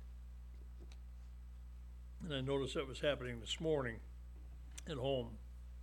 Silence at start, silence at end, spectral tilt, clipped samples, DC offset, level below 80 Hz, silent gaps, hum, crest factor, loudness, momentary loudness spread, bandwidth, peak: 0 s; 0 s; -5 dB/octave; under 0.1%; under 0.1%; -52 dBFS; none; 60 Hz at -50 dBFS; 20 dB; -42 LUFS; 16 LU; 17 kHz; -24 dBFS